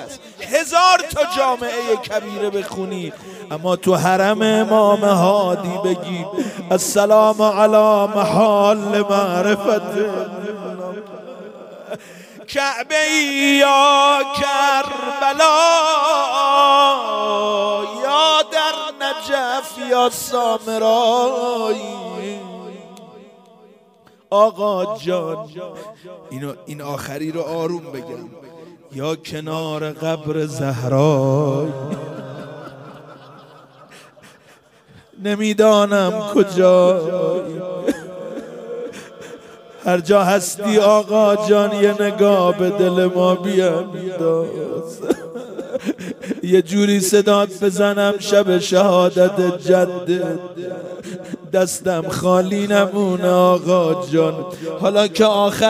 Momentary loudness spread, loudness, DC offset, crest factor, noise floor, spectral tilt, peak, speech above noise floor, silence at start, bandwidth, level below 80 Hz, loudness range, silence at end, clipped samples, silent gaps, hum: 18 LU; -17 LUFS; under 0.1%; 16 dB; -51 dBFS; -4.5 dB/octave; -2 dBFS; 35 dB; 0 s; 16 kHz; -60 dBFS; 10 LU; 0 s; under 0.1%; none; none